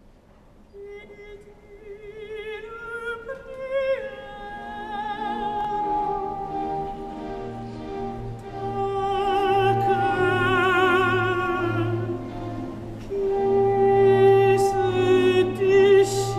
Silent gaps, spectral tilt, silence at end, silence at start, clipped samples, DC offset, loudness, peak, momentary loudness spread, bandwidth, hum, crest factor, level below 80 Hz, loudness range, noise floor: none; -6 dB/octave; 0 s; 0.75 s; under 0.1%; under 0.1%; -22 LUFS; -8 dBFS; 18 LU; 13 kHz; none; 16 dB; -46 dBFS; 12 LU; -52 dBFS